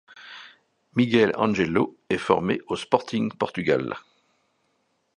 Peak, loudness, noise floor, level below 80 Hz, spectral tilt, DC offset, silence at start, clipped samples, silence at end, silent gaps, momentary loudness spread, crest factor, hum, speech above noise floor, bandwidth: -2 dBFS; -24 LUFS; -71 dBFS; -58 dBFS; -6.5 dB/octave; under 0.1%; 0.15 s; under 0.1%; 1.2 s; none; 19 LU; 22 dB; none; 48 dB; 11 kHz